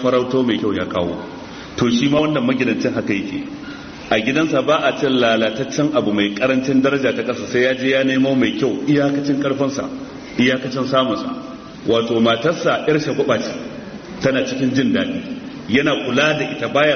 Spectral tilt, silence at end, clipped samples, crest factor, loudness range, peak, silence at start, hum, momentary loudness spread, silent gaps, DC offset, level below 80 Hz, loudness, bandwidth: -4 dB/octave; 0 s; under 0.1%; 16 dB; 3 LU; -2 dBFS; 0 s; none; 13 LU; none; under 0.1%; -52 dBFS; -18 LUFS; 6.6 kHz